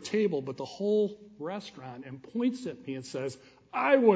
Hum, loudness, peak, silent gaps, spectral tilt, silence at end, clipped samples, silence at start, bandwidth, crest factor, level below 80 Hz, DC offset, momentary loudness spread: none; -32 LUFS; -10 dBFS; none; -6 dB/octave; 0 s; under 0.1%; 0 s; 8 kHz; 20 dB; -74 dBFS; under 0.1%; 16 LU